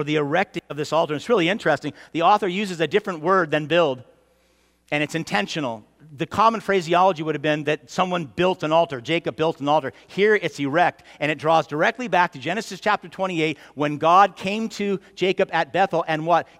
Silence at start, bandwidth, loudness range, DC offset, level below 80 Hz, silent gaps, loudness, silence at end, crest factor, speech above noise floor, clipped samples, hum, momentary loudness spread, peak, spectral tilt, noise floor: 0 s; 15.5 kHz; 2 LU; under 0.1%; -64 dBFS; none; -22 LUFS; 0.15 s; 18 dB; 40 dB; under 0.1%; none; 8 LU; -4 dBFS; -5 dB/octave; -62 dBFS